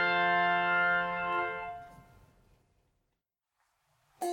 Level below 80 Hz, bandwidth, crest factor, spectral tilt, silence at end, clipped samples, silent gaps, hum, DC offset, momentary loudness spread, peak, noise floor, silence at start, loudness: -66 dBFS; 17 kHz; 16 dB; -4 dB/octave; 0 s; under 0.1%; none; none; under 0.1%; 14 LU; -18 dBFS; -85 dBFS; 0 s; -29 LUFS